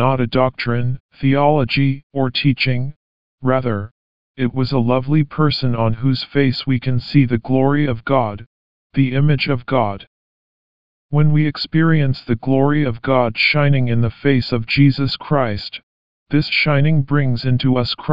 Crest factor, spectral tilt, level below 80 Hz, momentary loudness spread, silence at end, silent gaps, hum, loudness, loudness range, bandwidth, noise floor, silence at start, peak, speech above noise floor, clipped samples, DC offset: 16 dB; -9 dB/octave; -44 dBFS; 8 LU; 0 s; 1.00-1.09 s, 2.03-2.10 s, 2.96-3.38 s, 3.91-4.34 s, 8.46-8.90 s, 10.07-11.09 s, 15.83-16.26 s; none; -17 LUFS; 3 LU; 5.4 kHz; under -90 dBFS; 0 s; -2 dBFS; over 74 dB; under 0.1%; 3%